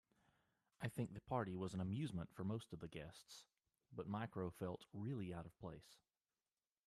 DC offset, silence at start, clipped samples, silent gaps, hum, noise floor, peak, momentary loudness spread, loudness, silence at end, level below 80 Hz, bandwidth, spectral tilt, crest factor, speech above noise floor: under 0.1%; 0.8 s; under 0.1%; none; none; under -90 dBFS; -28 dBFS; 13 LU; -49 LUFS; 0.9 s; -74 dBFS; 14.5 kHz; -7 dB/octave; 20 dB; over 42 dB